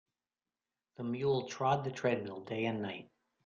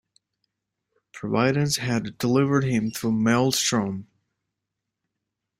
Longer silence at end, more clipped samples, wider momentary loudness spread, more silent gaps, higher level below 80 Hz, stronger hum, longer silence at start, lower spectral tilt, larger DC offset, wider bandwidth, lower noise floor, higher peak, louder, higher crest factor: second, 0.4 s vs 1.55 s; neither; about the same, 9 LU vs 7 LU; neither; second, -74 dBFS vs -60 dBFS; neither; second, 1 s vs 1.15 s; about the same, -6 dB/octave vs -5 dB/octave; neither; second, 7.4 kHz vs 16 kHz; first, under -90 dBFS vs -84 dBFS; second, -18 dBFS vs -6 dBFS; second, -36 LUFS vs -23 LUFS; about the same, 18 dB vs 18 dB